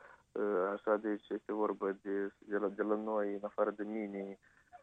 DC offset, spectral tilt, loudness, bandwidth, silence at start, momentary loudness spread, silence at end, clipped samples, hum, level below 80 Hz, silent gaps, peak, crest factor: under 0.1%; -8.5 dB/octave; -37 LUFS; 3.9 kHz; 0 s; 7 LU; 0.05 s; under 0.1%; none; -80 dBFS; none; -18 dBFS; 18 dB